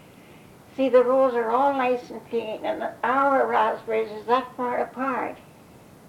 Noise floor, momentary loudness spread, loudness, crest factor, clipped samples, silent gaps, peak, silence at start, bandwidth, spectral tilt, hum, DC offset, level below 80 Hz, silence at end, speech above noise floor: -49 dBFS; 10 LU; -24 LUFS; 18 dB; under 0.1%; none; -6 dBFS; 0.3 s; 13.5 kHz; -5.5 dB/octave; none; under 0.1%; -66 dBFS; 0.7 s; 26 dB